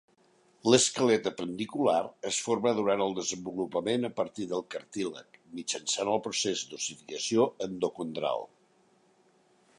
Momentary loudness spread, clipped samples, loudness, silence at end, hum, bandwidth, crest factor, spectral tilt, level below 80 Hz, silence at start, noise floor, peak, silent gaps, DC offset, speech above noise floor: 11 LU; under 0.1%; -30 LUFS; 1.3 s; none; 11.5 kHz; 24 dB; -3 dB/octave; -74 dBFS; 0.65 s; -66 dBFS; -6 dBFS; none; under 0.1%; 36 dB